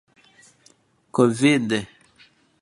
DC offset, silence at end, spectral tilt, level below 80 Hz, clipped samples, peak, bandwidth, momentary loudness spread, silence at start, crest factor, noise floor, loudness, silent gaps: under 0.1%; 0.75 s; -5.5 dB/octave; -64 dBFS; under 0.1%; -4 dBFS; 11.5 kHz; 11 LU; 1.15 s; 20 dB; -59 dBFS; -21 LUFS; none